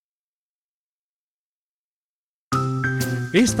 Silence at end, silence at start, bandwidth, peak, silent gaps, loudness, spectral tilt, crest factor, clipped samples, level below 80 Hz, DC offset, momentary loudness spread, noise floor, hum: 0 s; 2.5 s; 16 kHz; -6 dBFS; none; -22 LUFS; -5 dB/octave; 20 dB; under 0.1%; -52 dBFS; under 0.1%; 6 LU; under -90 dBFS; none